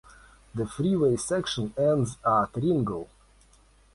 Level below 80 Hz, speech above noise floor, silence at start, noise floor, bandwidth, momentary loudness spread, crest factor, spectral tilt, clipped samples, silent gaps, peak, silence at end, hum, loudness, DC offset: -54 dBFS; 33 dB; 0.55 s; -59 dBFS; 11.5 kHz; 10 LU; 16 dB; -6 dB/octave; under 0.1%; none; -12 dBFS; 0.9 s; none; -27 LUFS; under 0.1%